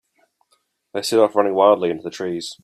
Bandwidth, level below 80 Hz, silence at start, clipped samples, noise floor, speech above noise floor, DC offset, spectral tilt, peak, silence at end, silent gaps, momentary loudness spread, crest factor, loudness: 15 kHz; -68 dBFS; 0.95 s; under 0.1%; -66 dBFS; 48 dB; under 0.1%; -4.5 dB/octave; -2 dBFS; 0.1 s; none; 11 LU; 18 dB; -19 LUFS